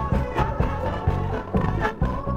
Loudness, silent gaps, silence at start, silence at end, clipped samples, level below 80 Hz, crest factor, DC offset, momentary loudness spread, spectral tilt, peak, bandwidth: -25 LUFS; none; 0 s; 0 s; under 0.1%; -30 dBFS; 16 dB; under 0.1%; 2 LU; -8.5 dB/octave; -8 dBFS; 8.8 kHz